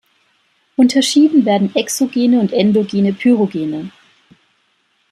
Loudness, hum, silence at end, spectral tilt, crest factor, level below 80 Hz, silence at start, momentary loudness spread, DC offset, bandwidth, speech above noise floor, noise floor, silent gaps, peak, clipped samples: -14 LUFS; none; 1.2 s; -5 dB/octave; 14 dB; -62 dBFS; 0.8 s; 11 LU; under 0.1%; 14.5 kHz; 48 dB; -61 dBFS; none; -2 dBFS; under 0.1%